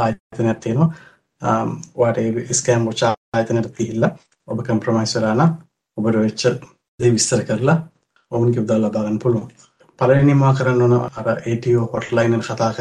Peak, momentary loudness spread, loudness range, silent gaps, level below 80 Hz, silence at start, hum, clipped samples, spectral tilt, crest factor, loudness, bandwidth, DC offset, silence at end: -2 dBFS; 8 LU; 3 LU; 0.20-0.30 s, 3.17-3.32 s, 6.88-6.98 s; -54 dBFS; 0 s; none; under 0.1%; -6 dB/octave; 16 dB; -19 LUFS; 11.5 kHz; under 0.1%; 0 s